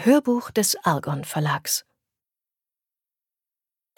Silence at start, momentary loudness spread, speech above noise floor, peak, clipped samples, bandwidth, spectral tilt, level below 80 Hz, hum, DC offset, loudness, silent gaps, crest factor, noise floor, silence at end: 0 s; 7 LU; over 68 dB; -4 dBFS; under 0.1%; 19 kHz; -4 dB/octave; -68 dBFS; none; under 0.1%; -23 LUFS; none; 20 dB; under -90 dBFS; 2.15 s